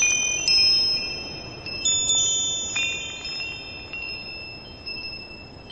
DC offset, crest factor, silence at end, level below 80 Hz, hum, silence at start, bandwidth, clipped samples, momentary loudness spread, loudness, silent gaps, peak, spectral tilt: under 0.1%; 16 dB; 0 s; -50 dBFS; none; 0 s; 8.8 kHz; under 0.1%; 18 LU; -21 LUFS; none; -10 dBFS; 0.5 dB/octave